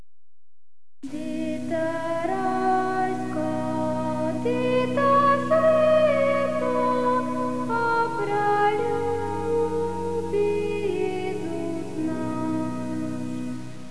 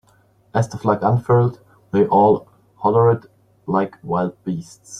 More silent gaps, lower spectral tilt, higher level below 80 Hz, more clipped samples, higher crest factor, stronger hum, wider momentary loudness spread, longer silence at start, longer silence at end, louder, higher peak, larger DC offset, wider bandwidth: neither; second, -6.5 dB/octave vs -8 dB/octave; second, -62 dBFS vs -56 dBFS; neither; about the same, 16 dB vs 18 dB; neither; about the same, 11 LU vs 10 LU; first, 1.05 s vs 0.55 s; about the same, 0 s vs 0 s; second, -24 LUFS vs -19 LUFS; second, -10 dBFS vs -2 dBFS; first, 2% vs under 0.1%; about the same, 11 kHz vs 10 kHz